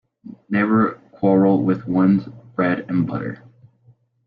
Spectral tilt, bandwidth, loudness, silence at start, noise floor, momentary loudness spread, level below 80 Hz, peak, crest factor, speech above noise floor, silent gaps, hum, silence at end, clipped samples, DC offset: -11 dB/octave; 4.8 kHz; -19 LUFS; 0.25 s; -56 dBFS; 12 LU; -56 dBFS; -6 dBFS; 16 dB; 37 dB; none; none; 0.9 s; under 0.1%; under 0.1%